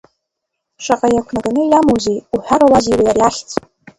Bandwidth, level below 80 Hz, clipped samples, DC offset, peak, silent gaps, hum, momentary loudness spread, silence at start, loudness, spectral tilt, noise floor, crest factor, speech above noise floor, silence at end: 11.5 kHz; -42 dBFS; under 0.1%; under 0.1%; 0 dBFS; none; none; 12 LU; 0.8 s; -14 LUFS; -5 dB/octave; -76 dBFS; 14 dB; 63 dB; 0.4 s